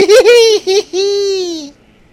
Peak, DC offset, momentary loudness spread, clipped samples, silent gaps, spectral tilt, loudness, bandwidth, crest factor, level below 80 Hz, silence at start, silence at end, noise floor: 0 dBFS; under 0.1%; 14 LU; 0.5%; none; -1 dB/octave; -10 LUFS; 16 kHz; 10 dB; -50 dBFS; 0 s; 0.45 s; -35 dBFS